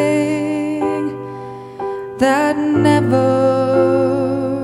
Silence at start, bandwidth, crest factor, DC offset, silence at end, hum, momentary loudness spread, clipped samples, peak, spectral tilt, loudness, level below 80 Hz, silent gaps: 0 s; 12.5 kHz; 14 dB; under 0.1%; 0 s; none; 13 LU; under 0.1%; -2 dBFS; -7 dB/octave; -16 LUFS; -54 dBFS; none